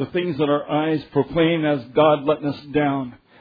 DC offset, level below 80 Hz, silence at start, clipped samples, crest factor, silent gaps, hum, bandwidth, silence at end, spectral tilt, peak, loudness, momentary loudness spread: under 0.1%; -54 dBFS; 0 s; under 0.1%; 16 dB; none; none; 5 kHz; 0.25 s; -9.5 dB/octave; -4 dBFS; -21 LUFS; 7 LU